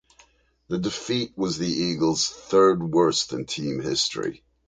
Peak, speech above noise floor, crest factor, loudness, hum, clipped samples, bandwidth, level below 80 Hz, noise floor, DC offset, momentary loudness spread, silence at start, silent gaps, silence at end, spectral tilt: -6 dBFS; 35 dB; 18 dB; -24 LUFS; none; under 0.1%; 9.6 kHz; -56 dBFS; -59 dBFS; under 0.1%; 10 LU; 0.7 s; none; 0.3 s; -4 dB/octave